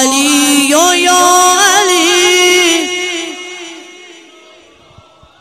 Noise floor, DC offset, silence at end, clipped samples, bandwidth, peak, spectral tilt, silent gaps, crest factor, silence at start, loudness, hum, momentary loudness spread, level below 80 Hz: -42 dBFS; under 0.1%; 1.5 s; under 0.1%; 15.5 kHz; 0 dBFS; 0 dB/octave; none; 12 dB; 0 s; -8 LUFS; none; 17 LU; -54 dBFS